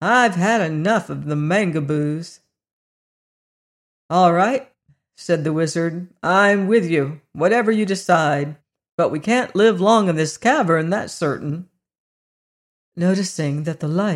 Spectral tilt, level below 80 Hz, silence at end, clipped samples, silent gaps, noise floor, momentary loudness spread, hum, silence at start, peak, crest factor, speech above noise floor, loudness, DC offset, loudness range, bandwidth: -5.5 dB/octave; -64 dBFS; 0 s; under 0.1%; 2.73-4.09 s, 8.92-8.98 s, 11.98-12.92 s; under -90 dBFS; 10 LU; none; 0 s; -4 dBFS; 16 dB; over 72 dB; -19 LUFS; under 0.1%; 5 LU; 12.5 kHz